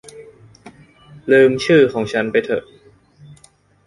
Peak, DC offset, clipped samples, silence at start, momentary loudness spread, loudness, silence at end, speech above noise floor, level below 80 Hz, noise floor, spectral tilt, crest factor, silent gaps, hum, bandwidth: -2 dBFS; under 0.1%; under 0.1%; 0.15 s; 12 LU; -15 LUFS; 1.25 s; 38 dB; -56 dBFS; -52 dBFS; -6 dB/octave; 18 dB; none; none; 11.5 kHz